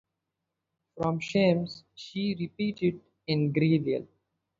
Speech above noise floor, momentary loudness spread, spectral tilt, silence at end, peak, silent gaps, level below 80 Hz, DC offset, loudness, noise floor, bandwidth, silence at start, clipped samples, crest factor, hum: 57 dB; 13 LU; -7.5 dB/octave; 0.55 s; -12 dBFS; none; -66 dBFS; under 0.1%; -29 LUFS; -85 dBFS; 7.6 kHz; 0.95 s; under 0.1%; 18 dB; none